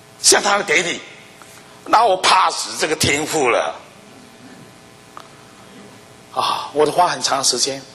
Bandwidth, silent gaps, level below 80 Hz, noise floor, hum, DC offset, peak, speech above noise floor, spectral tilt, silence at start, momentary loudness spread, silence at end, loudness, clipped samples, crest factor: 16 kHz; none; -56 dBFS; -44 dBFS; none; under 0.1%; 0 dBFS; 27 dB; -1.5 dB/octave; 0.2 s; 13 LU; 0 s; -16 LUFS; under 0.1%; 20 dB